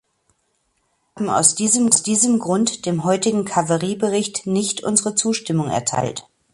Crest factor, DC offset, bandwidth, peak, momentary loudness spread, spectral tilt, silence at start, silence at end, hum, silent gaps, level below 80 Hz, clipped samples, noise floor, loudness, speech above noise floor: 20 dB; under 0.1%; 11.5 kHz; 0 dBFS; 7 LU; -3.5 dB/octave; 1.15 s; 0.3 s; none; none; -58 dBFS; under 0.1%; -68 dBFS; -18 LUFS; 49 dB